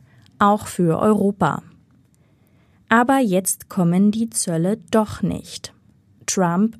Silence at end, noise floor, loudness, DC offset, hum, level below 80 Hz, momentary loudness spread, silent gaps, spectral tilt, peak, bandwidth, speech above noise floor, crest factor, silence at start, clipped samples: 0.05 s; -57 dBFS; -19 LUFS; under 0.1%; none; -54 dBFS; 13 LU; none; -5.5 dB/octave; -2 dBFS; 15 kHz; 38 dB; 18 dB; 0.4 s; under 0.1%